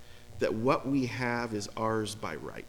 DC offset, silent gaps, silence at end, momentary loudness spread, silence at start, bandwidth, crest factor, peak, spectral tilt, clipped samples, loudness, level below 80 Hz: under 0.1%; none; 0 s; 10 LU; 0 s; 19 kHz; 20 dB; -12 dBFS; -5.5 dB/octave; under 0.1%; -32 LUFS; -56 dBFS